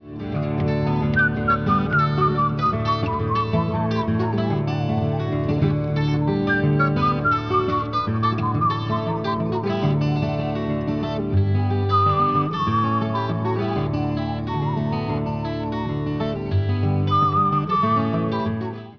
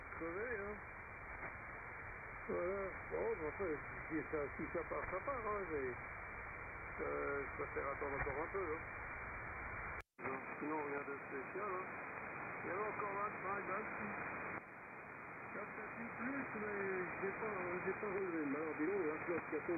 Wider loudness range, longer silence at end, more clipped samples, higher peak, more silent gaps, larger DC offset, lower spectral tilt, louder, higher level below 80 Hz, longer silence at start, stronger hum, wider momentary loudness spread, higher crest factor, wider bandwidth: about the same, 3 LU vs 3 LU; about the same, 0 s vs 0 s; neither; first, -8 dBFS vs -28 dBFS; neither; first, 0.3% vs under 0.1%; about the same, -8.5 dB/octave vs -9.5 dB/octave; first, -22 LUFS vs -44 LUFS; first, -42 dBFS vs -62 dBFS; about the same, 0 s vs 0 s; neither; about the same, 6 LU vs 7 LU; about the same, 14 dB vs 16 dB; first, 5.4 kHz vs 3.4 kHz